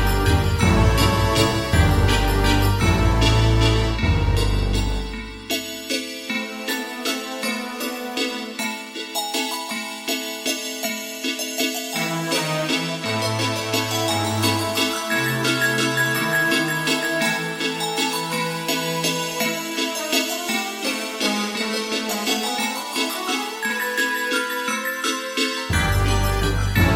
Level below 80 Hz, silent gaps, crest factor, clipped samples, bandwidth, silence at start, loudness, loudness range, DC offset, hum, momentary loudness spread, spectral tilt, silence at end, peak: -30 dBFS; none; 18 dB; under 0.1%; 17 kHz; 0 s; -21 LUFS; 7 LU; under 0.1%; none; 8 LU; -4 dB/octave; 0 s; -4 dBFS